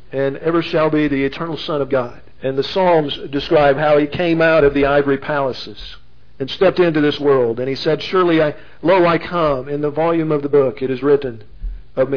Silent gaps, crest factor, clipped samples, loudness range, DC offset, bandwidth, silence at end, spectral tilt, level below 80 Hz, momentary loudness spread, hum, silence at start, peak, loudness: none; 14 dB; under 0.1%; 3 LU; 2%; 5.4 kHz; 0 s; -7.5 dB/octave; -40 dBFS; 13 LU; none; 0.1 s; -2 dBFS; -16 LUFS